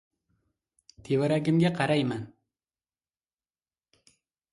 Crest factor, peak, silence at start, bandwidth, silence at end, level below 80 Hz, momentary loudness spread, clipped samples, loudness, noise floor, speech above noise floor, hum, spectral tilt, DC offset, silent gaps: 20 dB; -12 dBFS; 1.05 s; 11.5 kHz; 2.25 s; -68 dBFS; 11 LU; under 0.1%; -27 LUFS; under -90 dBFS; over 65 dB; none; -7 dB/octave; under 0.1%; none